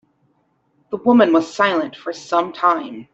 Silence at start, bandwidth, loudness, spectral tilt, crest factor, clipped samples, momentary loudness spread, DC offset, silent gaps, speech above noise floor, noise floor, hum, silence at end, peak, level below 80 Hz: 0.9 s; 8 kHz; -17 LUFS; -5 dB/octave; 16 dB; under 0.1%; 13 LU; under 0.1%; none; 46 dB; -64 dBFS; none; 0.1 s; -2 dBFS; -66 dBFS